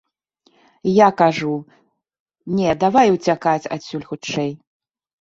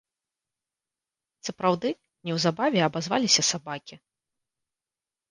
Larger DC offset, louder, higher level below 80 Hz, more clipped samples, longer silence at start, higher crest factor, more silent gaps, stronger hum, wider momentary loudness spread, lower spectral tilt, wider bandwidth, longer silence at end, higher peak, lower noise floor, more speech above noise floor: neither; first, -18 LUFS vs -25 LUFS; first, -58 dBFS vs -70 dBFS; neither; second, 0.85 s vs 1.45 s; about the same, 18 dB vs 22 dB; first, 2.20-2.26 s vs none; neither; second, 14 LU vs 17 LU; first, -6 dB/octave vs -3 dB/octave; second, 7.8 kHz vs 11 kHz; second, 0.65 s vs 1.35 s; first, -2 dBFS vs -6 dBFS; second, -62 dBFS vs under -90 dBFS; second, 44 dB vs over 64 dB